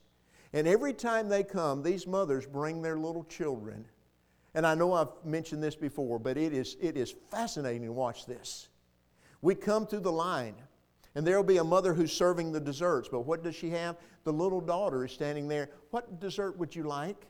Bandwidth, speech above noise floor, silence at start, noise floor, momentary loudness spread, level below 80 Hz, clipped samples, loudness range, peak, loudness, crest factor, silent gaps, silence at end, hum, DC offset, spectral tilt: 17 kHz; 37 dB; 0.55 s; -68 dBFS; 10 LU; -64 dBFS; under 0.1%; 5 LU; -14 dBFS; -32 LUFS; 18 dB; none; 0.05 s; 60 Hz at -65 dBFS; under 0.1%; -5.5 dB/octave